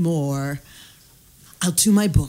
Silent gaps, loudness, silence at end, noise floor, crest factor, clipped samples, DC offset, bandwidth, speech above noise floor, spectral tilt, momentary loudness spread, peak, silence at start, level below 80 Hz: none; -20 LUFS; 0 s; -51 dBFS; 16 dB; under 0.1%; under 0.1%; 16 kHz; 31 dB; -5 dB/octave; 13 LU; -4 dBFS; 0 s; -36 dBFS